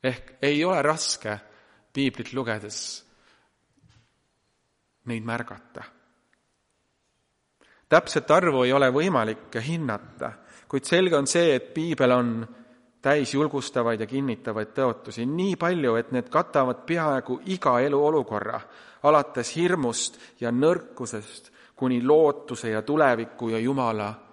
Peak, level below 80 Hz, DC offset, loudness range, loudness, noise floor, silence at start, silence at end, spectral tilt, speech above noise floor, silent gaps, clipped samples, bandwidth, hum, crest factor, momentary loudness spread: -4 dBFS; -66 dBFS; under 0.1%; 14 LU; -25 LUFS; -73 dBFS; 0.05 s; 0.15 s; -5 dB/octave; 49 dB; none; under 0.1%; 11.5 kHz; none; 22 dB; 14 LU